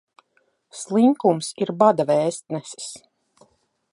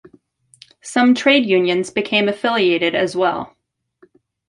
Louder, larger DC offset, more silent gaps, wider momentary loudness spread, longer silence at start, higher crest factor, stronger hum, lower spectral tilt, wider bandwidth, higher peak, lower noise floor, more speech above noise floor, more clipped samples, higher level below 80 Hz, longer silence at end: second, -20 LUFS vs -16 LUFS; neither; neither; first, 19 LU vs 10 LU; about the same, 0.75 s vs 0.85 s; about the same, 20 dB vs 18 dB; neither; about the same, -5.5 dB/octave vs -4.5 dB/octave; about the same, 11.5 kHz vs 11.5 kHz; about the same, -2 dBFS vs -2 dBFS; first, -67 dBFS vs -55 dBFS; first, 46 dB vs 39 dB; neither; second, -72 dBFS vs -62 dBFS; about the same, 0.95 s vs 1 s